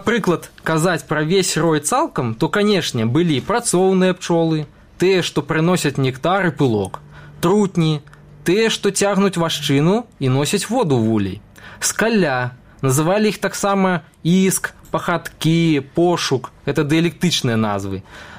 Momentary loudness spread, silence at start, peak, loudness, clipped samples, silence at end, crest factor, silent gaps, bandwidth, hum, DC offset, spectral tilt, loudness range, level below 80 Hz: 7 LU; 0 s; -6 dBFS; -18 LUFS; under 0.1%; 0 s; 12 dB; none; 16 kHz; none; 0.2%; -5 dB/octave; 1 LU; -50 dBFS